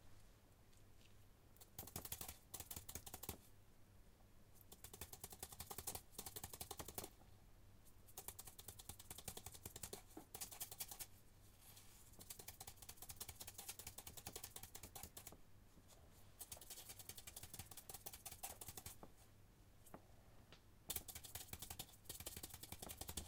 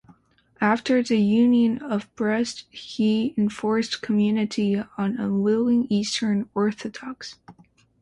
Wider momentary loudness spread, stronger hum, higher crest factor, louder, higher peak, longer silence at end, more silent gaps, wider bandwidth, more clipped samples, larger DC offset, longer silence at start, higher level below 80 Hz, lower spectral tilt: first, 18 LU vs 14 LU; neither; first, 30 dB vs 16 dB; second, -54 LUFS vs -23 LUFS; second, -28 dBFS vs -8 dBFS; second, 0 s vs 0.5 s; neither; first, 18 kHz vs 10.5 kHz; neither; neither; second, 0 s vs 0.6 s; second, -68 dBFS vs -62 dBFS; second, -2 dB/octave vs -5.5 dB/octave